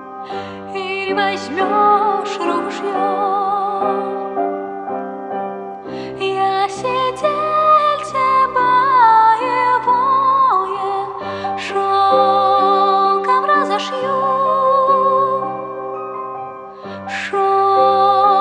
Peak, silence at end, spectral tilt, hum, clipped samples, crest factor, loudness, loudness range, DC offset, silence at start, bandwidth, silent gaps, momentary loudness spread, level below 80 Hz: -2 dBFS; 0 s; -4.5 dB/octave; none; under 0.1%; 14 dB; -16 LUFS; 7 LU; under 0.1%; 0 s; 10 kHz; none; 13 LU; -60 dBFS